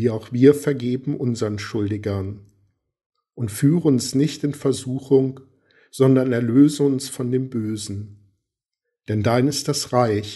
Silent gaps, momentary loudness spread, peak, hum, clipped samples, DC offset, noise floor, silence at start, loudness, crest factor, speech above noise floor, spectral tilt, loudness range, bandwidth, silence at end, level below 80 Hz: 3.06-3.10 s; 13 LU; -2 dBFS; none; under 0.1%; under 0.1%; -82 dBFS; 0 s; -20 LUFS; 20 dB; 62 dB; -6.5 dB/octave; 4 LU; 12 kHz; 0 s; -60 dBFS